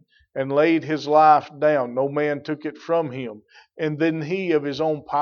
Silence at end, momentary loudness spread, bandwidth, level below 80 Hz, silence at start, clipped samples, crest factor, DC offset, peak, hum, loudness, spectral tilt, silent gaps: 0 s; 14 LU; 6.8 kHz; -70 dBFS; 0.35 s; under 0.1%; 18 dB; under 0.1%; -4 dBFS; none; -21 LUFS; -7 dB/octave; none